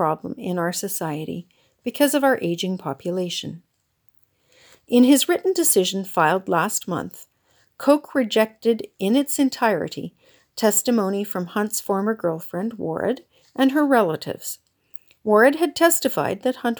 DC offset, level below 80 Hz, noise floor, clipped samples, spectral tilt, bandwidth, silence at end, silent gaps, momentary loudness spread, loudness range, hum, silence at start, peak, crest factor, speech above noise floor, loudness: under 0.1%; -68 dBFS; -64 dBFS; under 0.1%; -4 dB/octave; over 20 kHz; 0 s; none; 15 LU; 4 LU; none; 0 s; -2 dBFS; 20 dB; 43 dB; -21 LUFS